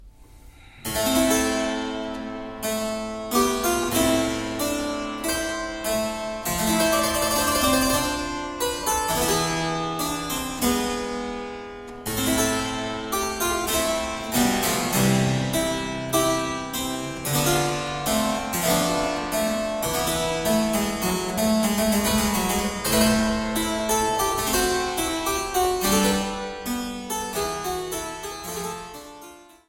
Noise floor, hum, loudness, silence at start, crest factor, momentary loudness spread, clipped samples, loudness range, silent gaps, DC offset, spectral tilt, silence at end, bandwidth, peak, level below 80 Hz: -47 dBFS; none; -24 LUFS; 0 s; 18 dB; 9 LU; under 0.1%; 4 LU; none; under 0.1%; -3.5 dB/octave; 0.25 s; 17 kHz; -6 dBFS; -42 dBFS